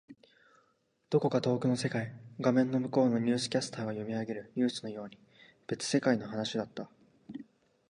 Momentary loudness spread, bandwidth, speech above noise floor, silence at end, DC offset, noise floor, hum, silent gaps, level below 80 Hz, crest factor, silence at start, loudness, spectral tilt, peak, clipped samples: 19 LU; 11 kHz; 42 dB; 0.5 s; under 0.1%; -73 dBFS; none; none; -74 dBFS; 20 dB; 0.1 s; -32 LUFS; -5.5 dB/octave; -14 dBFS; under 0.1%